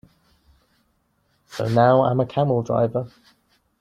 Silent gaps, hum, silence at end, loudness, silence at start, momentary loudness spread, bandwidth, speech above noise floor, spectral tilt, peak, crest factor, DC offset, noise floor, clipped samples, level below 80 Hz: none; none; 0.75 s; -20 LUFS; 1.5 s; 15 LU; 10.5 kHz; 48 dB; -8 dB/octave; -4 dBFS; 18 dB; under 0.1%; -67 dBFS; under 0.1%; -58 dBFS